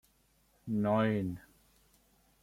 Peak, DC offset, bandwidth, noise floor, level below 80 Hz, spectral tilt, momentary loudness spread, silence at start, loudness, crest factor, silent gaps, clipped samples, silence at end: -18 dBFS; under 0.1%; 15.5 kHz; -70 dBFS; -66 dBFS; -8.5 dB/octave; 19 LU; 0.65 s; -33 LUFS; 20 dB; none; under 0.1%; 1.05 s